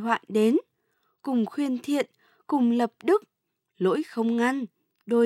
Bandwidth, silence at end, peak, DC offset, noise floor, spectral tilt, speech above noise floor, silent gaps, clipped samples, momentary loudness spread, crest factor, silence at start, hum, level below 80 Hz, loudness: 14 kHz; 0 s; -8 dBFS; under 0.1%; -73 dBFS; -6 dB/octave; 48 dB; none; under 0.1%; 6 LU; 18 dB; 0 s; none; -86 dBFS; -26 LUFS